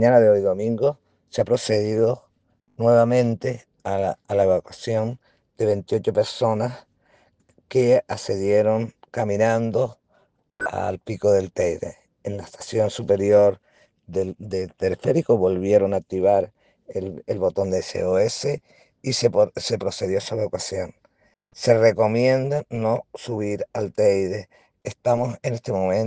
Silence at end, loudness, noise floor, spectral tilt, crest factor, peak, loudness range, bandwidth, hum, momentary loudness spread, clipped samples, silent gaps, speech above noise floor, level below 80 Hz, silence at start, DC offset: 0 s; -22 LUFS; -66 dBFS; -6 dB/octave; 20 dB; -2 dBFS; 3 LU; 9.6 kHz; none; 13 LU; under 0.1%; none; 45 dB; -62 dBFS; 0 s; under 0.1%